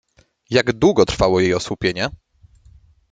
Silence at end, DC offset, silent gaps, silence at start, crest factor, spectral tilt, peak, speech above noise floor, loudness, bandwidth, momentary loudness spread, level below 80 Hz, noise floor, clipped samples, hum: 0.95 s; under 0.1%; none; 0.5 s; 18 dB; -5 dB/octave; 0 dBFS; 33 dB; -18 LUFS; 9.2 kHz; 7 LU; -40 dBFS; -51 dBFS; under 0.1%; none